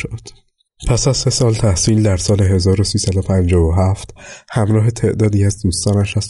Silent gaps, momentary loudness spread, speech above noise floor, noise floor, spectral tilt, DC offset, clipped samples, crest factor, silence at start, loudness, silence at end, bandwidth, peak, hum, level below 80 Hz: none; 10 LU; 35 dB; -49 dBFS; -5.5 dB/octave; under 0.1%; under 0.1%; 12 dB; 0 s; -15 LUFS; 0 s; 11.5 kHz; -4 dBFS; none; -30 dBFS